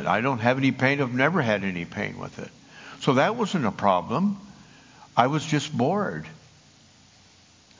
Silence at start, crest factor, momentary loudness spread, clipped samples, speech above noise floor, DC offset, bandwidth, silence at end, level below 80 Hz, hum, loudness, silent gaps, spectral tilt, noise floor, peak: 0 s; 26 dB; 16 LU; under 0.1%; 31 dB; under 0.1%; 7.6 kHz; 1.45 s; -60 dBFS; none; -24 LUFS; none; -6 dB/octave; -55 dBFS; 0 dBFS